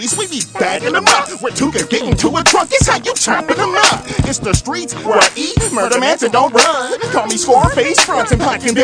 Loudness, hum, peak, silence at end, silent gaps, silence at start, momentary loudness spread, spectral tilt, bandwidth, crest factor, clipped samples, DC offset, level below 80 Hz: -13 LUFS; none; 0 dBFS; 0 s; none; 0 s; 6 LU; -3 dB/octave; 11 kHz; 14 dB; 0.1%; under 0.1%; -30 dBFS